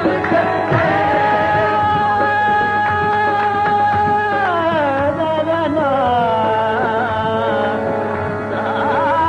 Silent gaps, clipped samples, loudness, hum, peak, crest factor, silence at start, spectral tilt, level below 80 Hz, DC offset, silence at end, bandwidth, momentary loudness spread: none; under 0.1%; -16 LUFS; none; -2 dBFS; 12 dB; 0 s; -7 dB/octave; -46 dBFS; under 0.1%; 0 s; 9.8 kHz; 4 LU